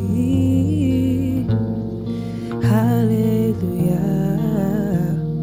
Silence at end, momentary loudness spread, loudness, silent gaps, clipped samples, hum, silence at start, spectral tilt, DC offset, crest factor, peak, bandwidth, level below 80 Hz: 0 s; 8 LU; -19 LUFS; none; under 0.1%; none; 0 s; -9 dB/octave; under 0.1%; 12 dB; -6 dBFS; 16 kHz; -40 dBFS